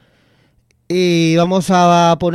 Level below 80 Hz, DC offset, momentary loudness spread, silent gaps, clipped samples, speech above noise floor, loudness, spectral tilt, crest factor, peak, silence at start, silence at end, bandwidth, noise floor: -50 dBFS; under 0.1%; 6 LU; none; under 0.1%; 44 dB; -13 LUFS; -6 dB/octave; 14 dB; -2 dBFS; 0.9 s; 0 s; 13 kHz; -56 dBFS